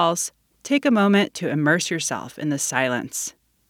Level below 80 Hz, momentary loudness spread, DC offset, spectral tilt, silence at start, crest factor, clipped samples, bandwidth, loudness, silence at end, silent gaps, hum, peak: -68 dBFS; 11 LU; under 0.1%; -4 dB/octave; 0 s; 18 dB; under 0.1%; 18 kHz; -22 LUFS; 0.4 s; none; none; -4 dBFS